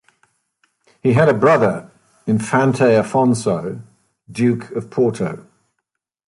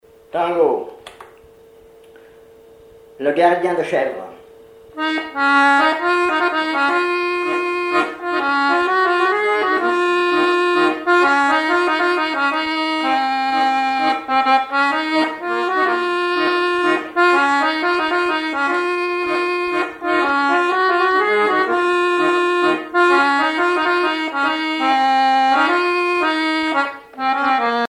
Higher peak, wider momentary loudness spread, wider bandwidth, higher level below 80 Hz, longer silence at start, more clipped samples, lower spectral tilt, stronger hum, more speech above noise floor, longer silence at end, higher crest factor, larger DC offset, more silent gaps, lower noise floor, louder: about the same, -2 dBFS vs -2 dBFS; first, 16 LU vs 6 LU; about the same, 11.5 kHz vs 11.5 kHz; first, -56 dBFS vs -62 dBFS; first, 1.05 s vs 0.35 s; neither; first, -7 dB/octave vs -3.5 dB/octave; neither; first, 61 dB vs 29 dB; first, 0.95 s vs 0.05 s; about the same, 16 dB vs 14 dB; neither; neither; first, -77 dBFS vs -45 dBFS; about the same, -17 LUFS vs -17 LUFS